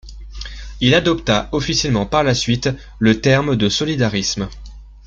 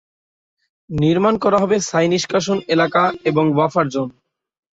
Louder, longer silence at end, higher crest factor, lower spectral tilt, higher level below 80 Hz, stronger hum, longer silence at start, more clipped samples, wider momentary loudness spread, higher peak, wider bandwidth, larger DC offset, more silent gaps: about the same, -17 LUFS vs -17 LUFS; second, 0 s vs 0.65 s; about the same, 16 dB vs 16 dB; about the same, -4.5 dB/octave vs -5.5 dB/octave; first, -34 dBFS vs -52 dBFS; neither; second, 0.05 s vs 0.9 s; neither; first, 16 LU vs 5 LU; about the same, -2 dBFS vs -2 dBFS; about the same, 7.8 kHz vs 8 kHz; neither; neither